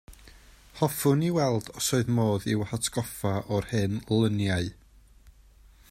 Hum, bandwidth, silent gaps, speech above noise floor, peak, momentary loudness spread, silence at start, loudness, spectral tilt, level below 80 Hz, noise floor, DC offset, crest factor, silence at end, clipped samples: none; 16 kHz; none; 29 dB; -8 dBFS; 6 LU; 0.1 s; -27 LUFS; -5.5 dB/octave; -54 dBFS; -55 dBFS; under 0.1%; 20 dB; 0.6 s; under 0.1%